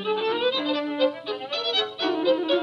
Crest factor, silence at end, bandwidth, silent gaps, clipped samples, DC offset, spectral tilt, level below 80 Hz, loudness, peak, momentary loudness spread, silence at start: 14 dB; 0 s; 7.2 kHz; none; under 0.1%; under 0.1%; -4 dB/octave; -80 dBFS; -25 LUFS; -10 dBFS; 4 LU; 0 s